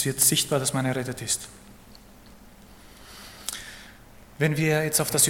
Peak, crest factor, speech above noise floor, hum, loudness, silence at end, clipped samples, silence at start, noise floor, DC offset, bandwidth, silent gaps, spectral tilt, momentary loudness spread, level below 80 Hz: -4 dBFS; 22 dB; 25 dB; none; -24 LUFS; 0 s; under 0.1%; 0 s; -49 dBFS; under 0.1%; 17.5 kHz; none; -3 dB/octave; 23 LU; -54 dBFS